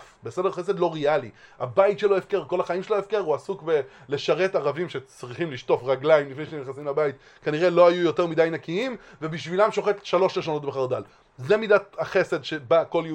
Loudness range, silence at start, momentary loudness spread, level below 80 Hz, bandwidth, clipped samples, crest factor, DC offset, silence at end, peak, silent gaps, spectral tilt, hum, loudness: 3 LU; 0 s; 12 LU; -66 dBFS; 9.8 kHz; under 0.1%; 20 dB; under 0.1%; 0 s; -4 dBFS; none; -6 dB/octave; none; -24 LUFS